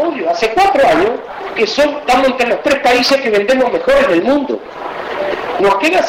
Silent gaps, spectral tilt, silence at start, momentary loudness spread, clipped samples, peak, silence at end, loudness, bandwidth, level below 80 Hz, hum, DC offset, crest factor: none; -3.5 dB/octave; 0 s; 11 LU; under 0.1%; -2 dBFS; 0 s; -13 LUFS; 16.5 kHz; -42 dBFS; none; under 0.1%; 10 dB